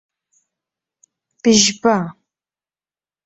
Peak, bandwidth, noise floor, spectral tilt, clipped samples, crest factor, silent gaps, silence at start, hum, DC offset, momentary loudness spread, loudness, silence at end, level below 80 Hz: 0 dBFS; 8.2 kHz; under -90 dBFS; -3 dB/octave; under 0.1%; 20 dB; none; 1.45 s; none; under 0.1%; 9 LU; -15 LUFS; 1.15 s; -58 dBFS